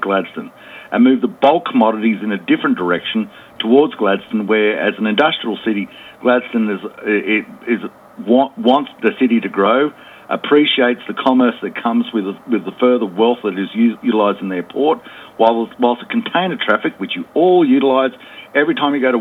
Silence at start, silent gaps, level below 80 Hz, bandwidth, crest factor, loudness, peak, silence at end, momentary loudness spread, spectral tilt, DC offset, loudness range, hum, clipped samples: 0 s; none; -64 dBFS; 4.3 kHz; 16 dB; -16 LUFS; 0 dBFS; 0 s; 9 LU; -7 dB/octave; under 0.1%; 2 LU; none; under 0.1%